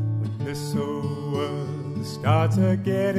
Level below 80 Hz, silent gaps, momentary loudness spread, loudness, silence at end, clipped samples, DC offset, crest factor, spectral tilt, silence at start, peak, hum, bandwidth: -58 dBFS; none; 10 LU; -25 LUFS; 0 s; under 0.1%; under 0.1%; 16 dB; -7.5 dB/octave; 0 s; -8 dBFS; none; 14.5 kHz